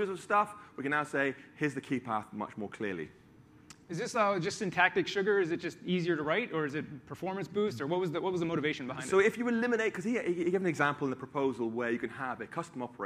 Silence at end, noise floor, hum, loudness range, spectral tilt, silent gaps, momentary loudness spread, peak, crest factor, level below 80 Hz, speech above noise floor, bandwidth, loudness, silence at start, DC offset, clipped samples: 0 s; -58 dBFS; none; 5 LU; -5.5 dB/octave; none; 11 LU; -10 dBFS; 22 dB; -72 dBFS; 26 dB; 14 kHz; -32 LUFS; 0 s; under 0.1%; under 0.1%